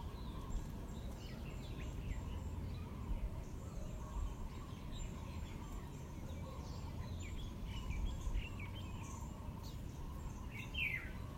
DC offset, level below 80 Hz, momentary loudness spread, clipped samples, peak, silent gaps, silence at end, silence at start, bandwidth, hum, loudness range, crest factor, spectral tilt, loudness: under 0.1%; -48 dBFS; 5 LU; under 0.1%; -28 dBFS; none; 0 s; 0 s; 16 kHz; none; 3 LU; 16 dB; -5.5 dB/octave; -47 LUFS